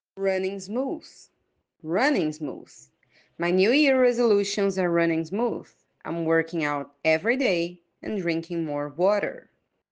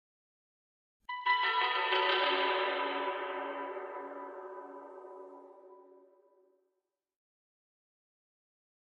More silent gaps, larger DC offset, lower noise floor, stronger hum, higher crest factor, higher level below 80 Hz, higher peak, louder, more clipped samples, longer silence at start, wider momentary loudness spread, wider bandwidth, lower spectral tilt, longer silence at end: neither; neither; second, -73 dBFS vs -86 dBFS; neither; about the same, 16 dB vs 20 dB; first, -72 dBFS vs under -90 dBFS; first, -10 dBFS vs -18 dBFS; first, -25 LUFS vs -32 LUFS; neither; second, 0.15 s vs 1.1 s; second, 14 LU vs 21 LU; first, 9.8 kHz vs 6.8 kHz; first, -5.5 dB/octave vs -2.5 dB/octave; second, 0.5 s vs 3.1 s